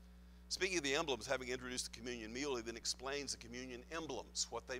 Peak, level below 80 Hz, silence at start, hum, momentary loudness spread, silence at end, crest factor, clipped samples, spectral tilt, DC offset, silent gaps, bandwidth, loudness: -20 dBFS; -60 dBFS; 0 s; none; 10 LU; 0 s; 22 dB; under 0.1%; -2 dB/octave; under 0.1%; none; 16 kHz; -42 LUFS